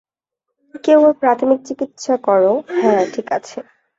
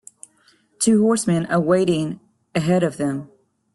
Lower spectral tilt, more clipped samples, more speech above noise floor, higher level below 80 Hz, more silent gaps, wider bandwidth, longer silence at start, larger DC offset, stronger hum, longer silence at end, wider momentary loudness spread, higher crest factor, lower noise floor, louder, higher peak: about the same, -5.5 dB/octave vs -5.5 dB/octave; neither; first, 64 dB vs 40 dB; second, -64 dBFS vs -58 dBFS; neither; second, 7.8 kHz vs 12.5 kHz; about the same, 0.75 s vs 0.8 s; neither; neither; second, 0.35 s vs 0.5 s; about the same, 12 LU vs 11 LU; about the same, 16 dB vs 16 dB; first, -79 dBFS vs -59 dBFS; first, -16 LUFS vs -20 LUFS; about the same, -2 dBFS vs -4 dBFS